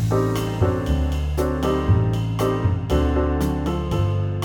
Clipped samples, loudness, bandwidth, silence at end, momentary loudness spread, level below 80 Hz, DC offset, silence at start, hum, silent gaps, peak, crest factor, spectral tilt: under 0.1%; -22 LUFS; 18 kHz; 0 s; 3 LU; -28 dBFS; under 0.1%; 0 s; none; none; -6 dBFS; 14 dB; -7.5 dB/octave